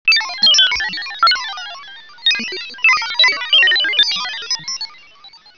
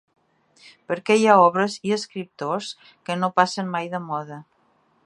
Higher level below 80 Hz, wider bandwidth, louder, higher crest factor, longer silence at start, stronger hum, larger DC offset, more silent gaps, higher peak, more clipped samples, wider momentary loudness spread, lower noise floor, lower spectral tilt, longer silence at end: first, -56 dBFS vs -74 dBFS; second, 5.4 kHz vs 11.5 kHz; first, -13 LUFS vs -22 LUFS; second, 16 dB vs 22 dB; second, 0.05 s vs 0.9 s; neither; first, 0.5% vs under 0.1%; neither; about the same, -2 dBFS vs -2 dBFS; neither; second, 14 LU vs 18 LU; second, -43 dBFS vs -63 dBFS; second, 1.5 dB/octave vs -5 dB/octave; second, 0.2 s vs 0.65 s